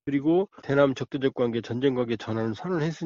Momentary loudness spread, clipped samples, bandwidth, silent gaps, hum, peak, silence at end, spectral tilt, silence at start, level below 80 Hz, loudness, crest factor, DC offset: 6 LU; under 0.1%; 7.4 kHz; none; none; -8 dBFS; 0 s; -6 dB/octave; 0.05 s; -62 dBFS; -26 LUFS; 18 dB; under 0.1%